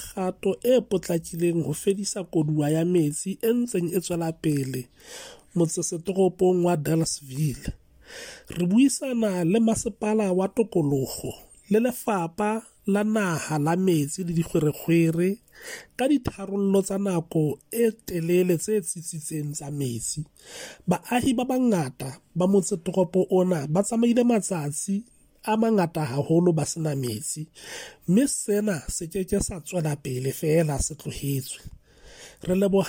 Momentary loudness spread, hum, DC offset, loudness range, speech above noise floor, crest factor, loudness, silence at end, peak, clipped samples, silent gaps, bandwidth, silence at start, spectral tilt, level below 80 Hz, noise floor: 12 LU; none; under 0.1%; 3 LU; 24 dB; 14 dB; -25 LUFS; 0 s; -10 dBFS; under 0.1%; none; 17 kHz; 0 s; -6 dB/octave; -50 dBFS; -48 dBFS